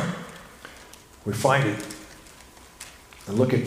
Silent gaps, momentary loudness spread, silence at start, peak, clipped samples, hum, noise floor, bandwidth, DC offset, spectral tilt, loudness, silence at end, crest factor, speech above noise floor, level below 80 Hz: none; 25 LU; 0 s; -4 dBFS; under 0.1%; none; -49 dBFS; 15.5 kHz; under 0.1%; -5.5 dB/octave; -26 LUFS; 0 s; 22 dB; 26 dB; -56 dBFS